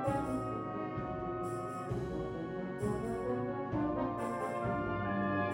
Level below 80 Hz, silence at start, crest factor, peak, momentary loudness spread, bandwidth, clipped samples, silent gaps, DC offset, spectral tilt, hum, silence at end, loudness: -54 dBFS; 0 s; 14 dB; -22 dBFS; 5 LU; 16 kHz; under 0.1%; none; under 0.1%; -7.5 dB/octave; none; 0 s; -37 LUFS